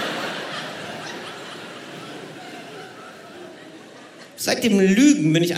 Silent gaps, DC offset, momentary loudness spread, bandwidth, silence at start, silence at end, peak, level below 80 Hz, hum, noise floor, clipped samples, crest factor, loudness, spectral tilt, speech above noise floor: none; under 0.1%; 26 LU; 16 kHz; 0 s; 0 s; -4 dBFS; -68 dBFS; none; -43 dBFS; under 0.1%; 18 dB; -20 LUFS; -4.5 dB/octave; 26 dB